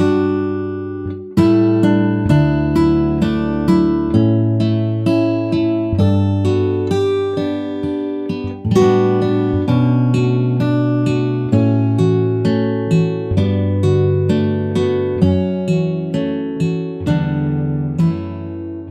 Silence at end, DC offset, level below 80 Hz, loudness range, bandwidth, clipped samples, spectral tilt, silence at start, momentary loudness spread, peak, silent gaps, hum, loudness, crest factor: 0 s; under 0.1%; -38 dBFS; 3 LU; 11 kHz; under 0.1%; -8.5 dB/octave; 0 s; 7 LU; -2 dBFS; none; none; -16 LUFS; 14 dB